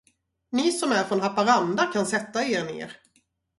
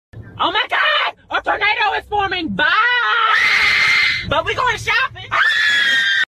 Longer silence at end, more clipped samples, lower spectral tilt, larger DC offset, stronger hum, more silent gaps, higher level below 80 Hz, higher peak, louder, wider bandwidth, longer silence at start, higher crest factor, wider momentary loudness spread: first, 0.65 s vs 0.05 s; neither; first, -4 dB/octave vs -2 dB/octave; neither; neither; neither; second, -68 dBFS vs -46 dBFS; second, -8 dBFS vs -4 dBFS; second, -24 LUFS vs -15 LUFS; second, 11.5 kHz vs 15.5 kHz; first, 0.5 s vs 0.15 s; about the same, 18 dB vs 14 dB; first, 11 LU vs 8 LU